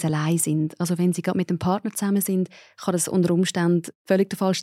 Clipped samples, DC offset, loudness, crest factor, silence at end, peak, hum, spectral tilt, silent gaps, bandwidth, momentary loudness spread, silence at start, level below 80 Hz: under 0.1%; under 0.1%; -23 LUFS; 14 dB; 0 s; -8 dBFS; none; -5.5 dB/octave; 3.95-4.05 s; 16 kHz; 4 LU; 0 s; -64 dBFS